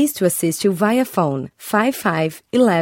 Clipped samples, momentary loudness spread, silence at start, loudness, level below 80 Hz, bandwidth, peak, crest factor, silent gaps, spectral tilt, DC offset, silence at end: under 0.1%; 5 LU; 0 s; -19 LUFS; -62 dBFS; 18 kHz; -2 dBFS; 16 dB; none; -5 dB/octave; under 0.1%; 0 s